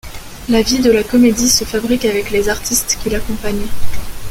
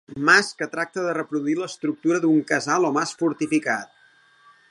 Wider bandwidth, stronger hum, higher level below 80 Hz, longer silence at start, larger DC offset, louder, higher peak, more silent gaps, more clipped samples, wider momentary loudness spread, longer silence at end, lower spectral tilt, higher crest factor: first, 17 kHz vs 11.5 kHz; neither; first, -30 dBFS vs -70 dBFS; about the same, 0.05 s vs 0.1 s; neither; first, -14 LUFS vs -22 LUFS; about the same, 0 dBFS vs -2 dBFS; neither; neither; first, 17 LU vs 10 LU; second, 0 s vs 0.85 s; about the same, -3 dB/octave vs -4 dB/octave; second, 14 dB vs 20 dB